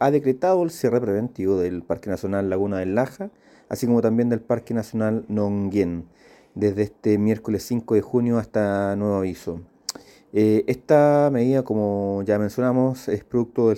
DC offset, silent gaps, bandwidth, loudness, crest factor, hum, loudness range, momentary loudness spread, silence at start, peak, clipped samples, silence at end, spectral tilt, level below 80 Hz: under 0.1%; none; 17 kHz; -22 LUFS; 18 dB; none; 4 LU; 9 LU; 0 s; -4 dBFS; under 0.1%; 0 s; -7.5 dB/octave; -56 dBFS